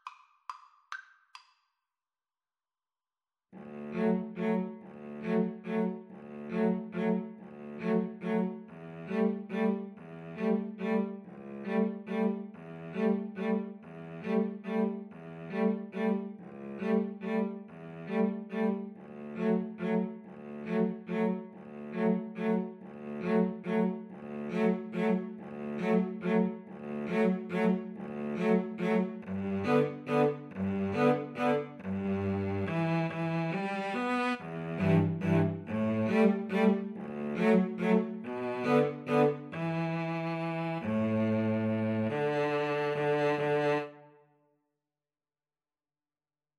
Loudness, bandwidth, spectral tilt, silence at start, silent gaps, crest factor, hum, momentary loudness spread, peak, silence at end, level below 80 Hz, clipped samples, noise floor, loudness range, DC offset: -32 LUFS; 8.8 kHz; -8.5 dB/octave; 0.05 s; none; 18 dB; none; 16 LU; -14 dBFS; 2.5 s; -76 dBFS; under 0.1%; under -90 dBFS; 5 LU; under 0.1%